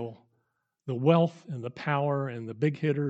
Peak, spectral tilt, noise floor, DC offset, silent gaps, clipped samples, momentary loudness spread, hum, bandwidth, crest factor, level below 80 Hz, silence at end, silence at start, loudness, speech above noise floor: -8 dBFS; -8.5 dB/octave; -78 dBFS; under 0.1%; none; under 0.1%; 15 LU; none; 7.8 kHz; 20 dB; -78 dBFS; 0 s; 0 s; -28 LUFS; 50 dB